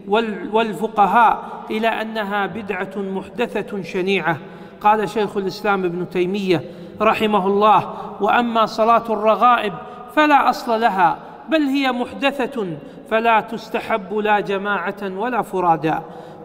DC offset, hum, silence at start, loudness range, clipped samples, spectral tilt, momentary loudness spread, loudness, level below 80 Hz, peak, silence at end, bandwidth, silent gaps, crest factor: under 0.1%; none; 0 s; 5 LU; under 0.1%; -6 dB/octave; 11 LU; -19 LUFS; -56 dBFS; -2 dBFS; 0 s; 16 kHz; none; 18 dB